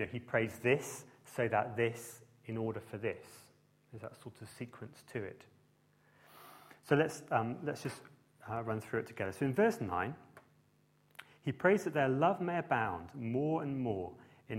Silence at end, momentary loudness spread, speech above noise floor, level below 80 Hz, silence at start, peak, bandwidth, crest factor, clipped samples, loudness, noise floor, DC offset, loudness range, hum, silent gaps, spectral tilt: 0 s; 21 LU; 35 dB; -72 dBFS; 0 s; -14 dBFS; 16 kHz; 24 dB; under 0.1%; -36 LUFS; -71 dBFS; under 0.1%; 12 LU; none; none; -6.5 dB/octave